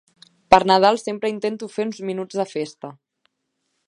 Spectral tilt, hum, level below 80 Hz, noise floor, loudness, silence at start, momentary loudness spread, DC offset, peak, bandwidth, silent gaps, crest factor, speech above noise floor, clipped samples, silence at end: -4.5 dB/octave; none; -58 dBFS; -75 dBFS; -20 LUFS; 0.5 s; 15 LU; under 0.1%; 0 dBFS; 11 kHz; none; 22 dB; 55 dB; under 0.1%; 0.95 s